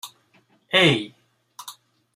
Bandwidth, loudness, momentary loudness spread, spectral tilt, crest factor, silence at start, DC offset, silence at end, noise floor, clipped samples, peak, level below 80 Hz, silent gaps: 15.5 kHz; -19 LUFS; 24 LU; -4.5 dB/octave; 22 dB; 0.05 s; under 0.1%; 0.45 s; -61 dBFS; under 0.1%; -4 dBFS; -64 dBFS; none